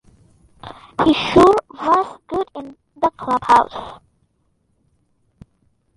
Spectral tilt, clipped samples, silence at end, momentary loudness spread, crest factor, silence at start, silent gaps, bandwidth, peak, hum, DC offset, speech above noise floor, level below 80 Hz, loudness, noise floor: -5.5 dB/octave; under 0.1%; 2 s; 24 LU; 18 dB; 0.65 s; none; 11.5 kHz; -2 dBFS; none; under 0.1%; 49 dB; -46 dBFS; -17 LUFS; -65 dBFS